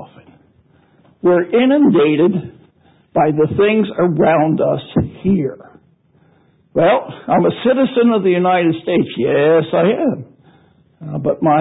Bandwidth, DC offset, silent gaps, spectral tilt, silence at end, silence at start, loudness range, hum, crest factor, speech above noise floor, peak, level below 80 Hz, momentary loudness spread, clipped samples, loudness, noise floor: 4 kHz; under 0.1%; none; -12.5 dB/octave; 0 s; 0 s; 3 LU; none; 14 dB; 40 dB; -2 dBFS; -48 dBFS; 8 LU; under 0.1%; -15 LUFS; -53 dBFS